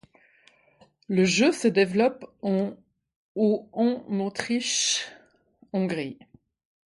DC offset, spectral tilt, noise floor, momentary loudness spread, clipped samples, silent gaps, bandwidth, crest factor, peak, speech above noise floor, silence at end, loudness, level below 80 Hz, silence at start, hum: under 0.1%; -4 dB/octave; -61 dBFS; 12 LU; under 0.1%; 3.16-3.35 s; 11.5 kHz; 20 dB; -8 dBFS; 36 dB; 0.7 s; -25 LUFS; -70 dBFS; 1.1 s; none